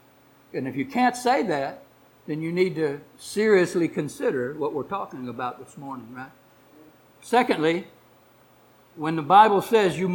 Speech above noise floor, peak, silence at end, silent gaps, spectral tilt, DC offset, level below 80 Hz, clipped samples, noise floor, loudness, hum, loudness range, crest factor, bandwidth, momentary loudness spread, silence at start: 33 dB; -4 dBFS; 0 s; none; -5.5 dB/octave; under 0.1%; -66 dBFS; under 0.1%; -56 dBFS; -23 LUFS; none; 7 LU; 22 dB; 18.5 kHz; 19 LU; 0.55 s